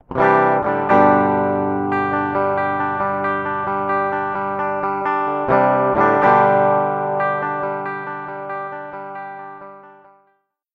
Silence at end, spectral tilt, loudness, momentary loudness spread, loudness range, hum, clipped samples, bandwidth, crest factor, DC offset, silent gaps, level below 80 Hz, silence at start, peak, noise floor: 0.85 s; -8.5 dB/octave; -18 LUFS; 16 LU; 8 LU; none; under 0.1%; 6.4 kHz; 18 dB; under 0.1%; none; -54 dBFS; 0.1 s; 0 dBFS; -64 dBFS